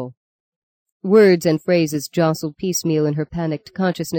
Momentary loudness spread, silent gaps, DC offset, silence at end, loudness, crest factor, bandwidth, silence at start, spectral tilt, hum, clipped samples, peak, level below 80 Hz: 12 LU; 0.17-0.86 s, 0.92-1.00 s; under 0.1%; 0 s; -18 LUFS; 16 dB; 17 kHz; 0 s; -5.5 dB/octave; none; under 0.1%; -4 dBFS; -54 dBFS